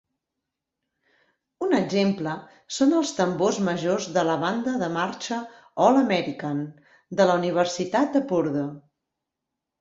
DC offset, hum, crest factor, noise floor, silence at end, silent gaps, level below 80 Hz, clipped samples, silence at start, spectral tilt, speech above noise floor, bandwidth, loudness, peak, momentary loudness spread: under 0.1%; none; 20 dB; -84 dBFS; 1 s; none; -68 dBFS; under 0.1%; 1.6 s; -5.5 dB/octave; 61 dB; 8 kHz; -24 LUFS; -4 dBFS; 11 LU